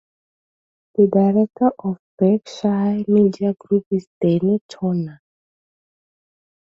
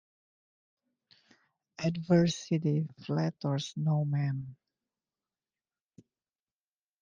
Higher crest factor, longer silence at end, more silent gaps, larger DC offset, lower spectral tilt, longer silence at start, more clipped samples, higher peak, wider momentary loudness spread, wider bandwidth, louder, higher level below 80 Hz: about the same, 16 dB vs 20 dB; second, 1.5 s vs 2.45 s; first, 1.99-2.18 s, 3.86-3.91 s, 4.07-4.21 s, 4.61-4.69 s vs none; neither; first, -9 dB/octave vs -7 dB/octave; second, 1 s vs 1.8 s; neither; first, -4 dBFS vs -12 dBFS; about the same, 9 LU vs 8 LU; about the same, 7.2 kHz vs 7.6 kHz; first, -19 LUFS vs -31 LUFS; first, -62 dBFS vs -72 dBFS